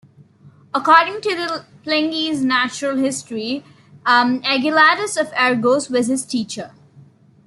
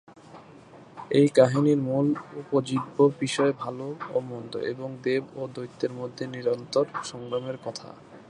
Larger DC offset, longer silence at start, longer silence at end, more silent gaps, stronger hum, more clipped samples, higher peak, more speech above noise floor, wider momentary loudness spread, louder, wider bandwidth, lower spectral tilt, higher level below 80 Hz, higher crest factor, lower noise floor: neither; first, 0.45 s vs 0.1 s; first, 0.8 s vs 0.05 s; neither; neither; neither; about the same, -2 dBFS vs -4 dBFS; first, 30 dB vs 23 dB; second, 12 LU vs 15 LU; first, -17 LUFS vs -27 LUFS; about the same, 12 kHz vs 11 kHz; second, -3 dB/octave vs -6.5 dB/octave; about the same, -66 dBFS vs -70 dBFS; about the same, 18 dB vs 22 dB; about the same, -48 dBFS vs -49 dBFS